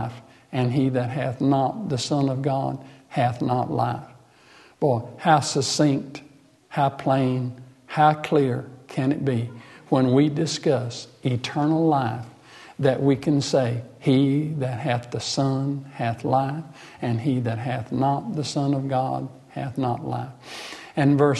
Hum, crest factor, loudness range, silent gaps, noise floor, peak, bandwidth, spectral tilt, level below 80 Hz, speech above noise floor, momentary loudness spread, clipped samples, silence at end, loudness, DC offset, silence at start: none; 18 dB; 3 LU; none; -52 dBFS; -6 dBFS; 12 kHz; -6 dB/octave; -62 dBFS; 29 dB; 13 LU; under 0.1%; 0 s; -24 LUFS; under 0.1%; 0 s